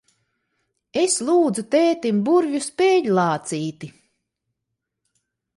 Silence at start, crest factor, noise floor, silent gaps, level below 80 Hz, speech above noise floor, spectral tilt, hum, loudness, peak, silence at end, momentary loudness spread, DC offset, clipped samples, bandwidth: 0.95 s; 14 dB; -80 dBFS; none; -68 dBFS; 61 dB; -4.5 dB/octave; none; -20 LUFS; -8 dBFS; 1.65 s; 11 LU; under 0.1%; under 0.1%; 11.5 kHz